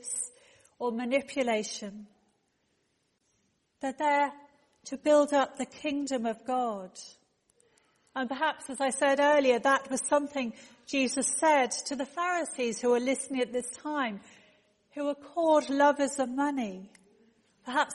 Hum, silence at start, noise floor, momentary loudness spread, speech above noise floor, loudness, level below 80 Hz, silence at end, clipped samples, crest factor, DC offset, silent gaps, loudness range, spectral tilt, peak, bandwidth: none; 0.05 s; -75 dBFS; 15 LU; 46 dB; -29 LUFS; -74 dBFS; 0 s; under 0.1%; 18 dB; under 0.1%; none; 7 LU; -2.5 dB/octave; -12 dBFS; 11.5 kHz